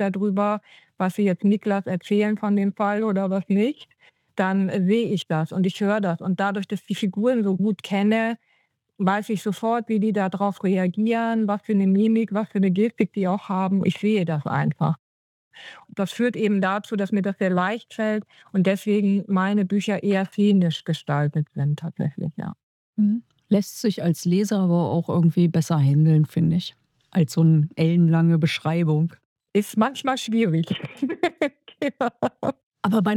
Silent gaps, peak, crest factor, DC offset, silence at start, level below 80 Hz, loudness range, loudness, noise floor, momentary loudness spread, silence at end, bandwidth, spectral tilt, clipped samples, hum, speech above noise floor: 14.99-15.51 s, 22.63-22.93 s, 29.25-29.36 s, 32.63-32.72 s; -6 dBFS; 16 dB; under 0.1%; 0 s; -68 dBFS; 4 LU; -23 LUFS; -67 dBFS; 9 LU; 0 s; 14 kHz; -7.5 dB/octave; under 0.1%; none; 46 dB